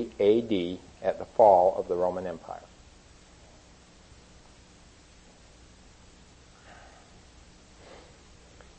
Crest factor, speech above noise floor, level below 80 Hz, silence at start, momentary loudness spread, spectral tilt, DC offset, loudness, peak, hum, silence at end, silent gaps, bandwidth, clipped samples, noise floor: 24 dB; 30 dB; -58 dBFS; 0 s; 24 LU; -6.5 dB/octave; under 0.1%; -25 LUFS; -6 dBFS; none; 0.8 s; none; 8.6 kHz; under 0.1%; -55 dBFS